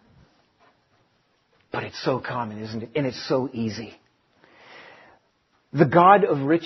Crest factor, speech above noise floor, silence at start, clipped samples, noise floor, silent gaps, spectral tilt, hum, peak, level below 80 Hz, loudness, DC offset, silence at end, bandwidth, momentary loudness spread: 24 dB; 45 dB; 1.75 s; under 0.1%; -67 dBFS; none; -5.5 dB/octave; none; -2 dBFS; -64 dBFS; -22 LUFS; under 0.1%; 0 s; 6.2 kHz; 18 LU